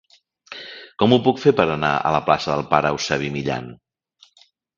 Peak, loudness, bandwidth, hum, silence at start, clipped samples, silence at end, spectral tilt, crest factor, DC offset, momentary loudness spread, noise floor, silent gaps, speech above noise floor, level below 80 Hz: 0 dBFS; -19 LUFS; 7.4 kHz; none; 0.5 s; under 0.1%; 1.05 s; -5.5 dB/octave; 22 dB; under 0.1%; 19 LU; -57 dBFS; none; 38 dB; -52 dBFS